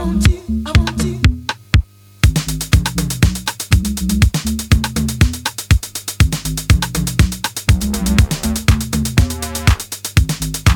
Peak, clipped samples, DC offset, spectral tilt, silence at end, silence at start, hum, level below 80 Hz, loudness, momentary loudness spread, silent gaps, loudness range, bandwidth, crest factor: 0 dBFS; under 0.1%; under 0.1%; -4.5 dB/octave; 0 s; 0 s; none; -20 dBFS; -17 LUFS; 4 LU; none; 1 LU; 19.5 kHz; 16 dB